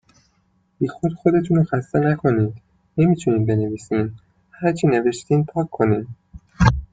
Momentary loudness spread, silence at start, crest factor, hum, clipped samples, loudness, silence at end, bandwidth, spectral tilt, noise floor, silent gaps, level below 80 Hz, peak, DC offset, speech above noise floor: 7 LU; 0.8 s; 18 dB; none; under 0.1%; -20 LUFS; 0.05 s; 9.2 kHz; -8 dB/octave; -63 dBFS; none; -38 dBFS; -2 dBFS; under 0.1%; 45 dB